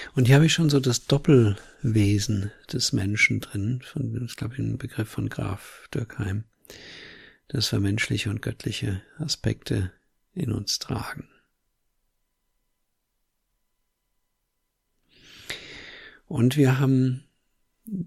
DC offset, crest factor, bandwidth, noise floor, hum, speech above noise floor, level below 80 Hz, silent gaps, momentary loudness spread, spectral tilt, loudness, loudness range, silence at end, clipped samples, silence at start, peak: under 0.1%; 22 dB; 15 kHz; -77 dBFS; none; 53 dB; -50 dBFS; none; 20 LU; -5.5 dB/octave; -25 LUFS; 12 LU; 0 s; under 0.1%; 0 s; -4 dBFS